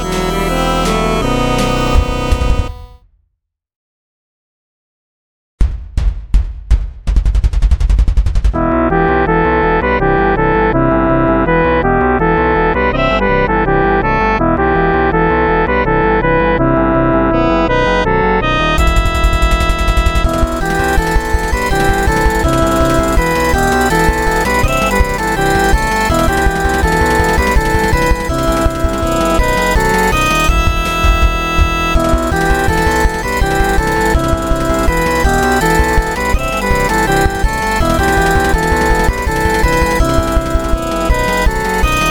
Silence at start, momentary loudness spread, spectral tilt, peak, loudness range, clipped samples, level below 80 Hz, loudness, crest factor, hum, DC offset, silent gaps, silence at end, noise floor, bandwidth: 0 s; 4 LU; -5.5 dB/octave; 0 dBFS; 5 LU; under 0.1%; -16 dBFS; -13 LUFS; 12 dB; none; under 0.1%; 3.76-5.58 s; 0 s; -69 dBFS; 19 kHz